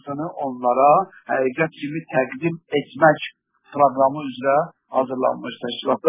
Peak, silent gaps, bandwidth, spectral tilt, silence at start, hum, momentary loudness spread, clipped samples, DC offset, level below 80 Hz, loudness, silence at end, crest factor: -2 dBFS; none; 3.9 kHz; -9.5 dB/octave; 0.05 s; none; 11 LU; under 0.1%; under 0.1%; -68 dBFS; -21 LUFS; 0 s; 20 dB